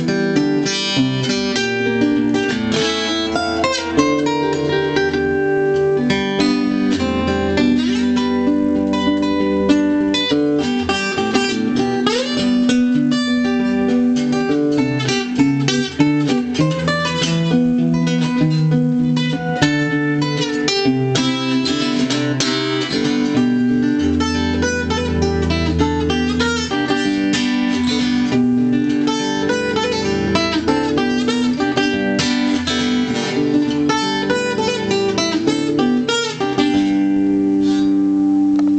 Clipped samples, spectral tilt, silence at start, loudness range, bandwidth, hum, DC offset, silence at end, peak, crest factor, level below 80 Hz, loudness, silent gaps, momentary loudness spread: under 0.1%; -5 dB/octave; 0 s; 1 LU; 8.8 kHz; none; under 0.1%; 0 s; -4 dBFS; 14 dB; -40 dBFS; -17 LUFS; none; 3 LU